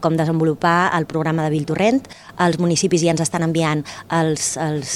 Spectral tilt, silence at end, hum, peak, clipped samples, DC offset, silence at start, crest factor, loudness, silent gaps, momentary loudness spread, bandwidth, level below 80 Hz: -5 dB/octave; 0 s; none; -2 dBFS; under 0.1%; under 0.1%; 0 s; 16 dB; -19 LUFS; none; 5 LU; 13.5 kHz; -54 dBFS